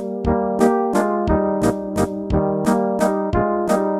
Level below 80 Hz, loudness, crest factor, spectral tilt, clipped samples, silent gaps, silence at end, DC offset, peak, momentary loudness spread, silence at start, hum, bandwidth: -34 dBFS; -19 LUFS; 16 dB; -7 dB/octave; under 0.1%; none; 0 s; under 0.1%; -2 dBFS; 4 LU; 0 s; none; 15 kHz